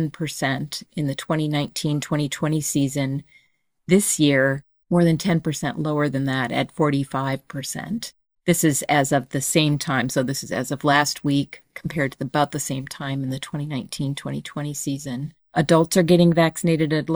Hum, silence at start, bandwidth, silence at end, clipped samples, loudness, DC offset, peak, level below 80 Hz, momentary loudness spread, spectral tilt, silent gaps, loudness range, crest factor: none; 0 s; over 20 kHz; 0 s; under 0.1%; -22 LUFS; under 0.1%; -2 dBFS; -54 dBFS; 12 LU; -5 dB/octave; none; 5 LU; 20 dB